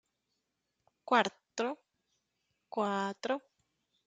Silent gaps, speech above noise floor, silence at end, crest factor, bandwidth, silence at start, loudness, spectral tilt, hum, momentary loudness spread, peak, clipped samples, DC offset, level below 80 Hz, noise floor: none; 51 dB; 0.7 s; 26 dB; 9.4 kHz; 1.05 s; -34 LUFS; -4 dB/octave; none; 12 LU; -12 dBFS; under 0.1%; under 0.1%; -86 dBFS; -84 dBFS